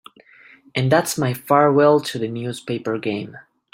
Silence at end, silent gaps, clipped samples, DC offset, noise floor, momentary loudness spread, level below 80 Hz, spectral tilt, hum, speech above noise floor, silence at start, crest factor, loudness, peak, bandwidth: 0.3 s; none; under 0.1%; under 0.1%; -49 dBFS; 13 LU; -62 dBFS; -5.5 dB/octave; none; 30 dB; 0.75 s; 18 dB; -19 LUFS; -2 dBFS; 16.5 kHz